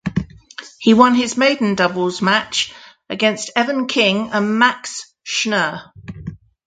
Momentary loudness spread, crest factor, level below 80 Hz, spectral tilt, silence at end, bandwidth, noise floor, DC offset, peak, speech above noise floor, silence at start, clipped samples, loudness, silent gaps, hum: 19 LU; 18 dB; -50 dBFS; -4 dB/octave; 0.35 s; 9.4 kHz; -38 dBFS; under 0.1%; 0 dBFS; 22 dB; 0.05 s; under 0.1%; -17 LUFS; none; none